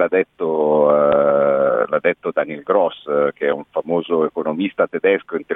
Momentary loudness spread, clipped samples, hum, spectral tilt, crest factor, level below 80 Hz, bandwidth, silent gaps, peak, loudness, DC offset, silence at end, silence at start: 7 LU; under 0.1%; none; -9 dB/octave; 16 dB; -62 dBFS; 3.9 kHz; none; -2 dBFS; -18 LUFS; under 0.1%; 0 s; 0 s